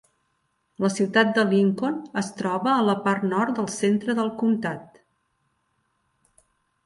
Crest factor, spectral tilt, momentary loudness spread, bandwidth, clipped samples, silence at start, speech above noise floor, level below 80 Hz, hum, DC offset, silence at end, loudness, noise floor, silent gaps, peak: 18 dB; -5.5 dB/octave; 8 LU; 11.5 kHz; under 0.1%; 0.8 s; 49 dB; -70 dBFS; none; under 0.1%; 2 s; -23 LUFS; -72 dBFS; none; -6 dBFS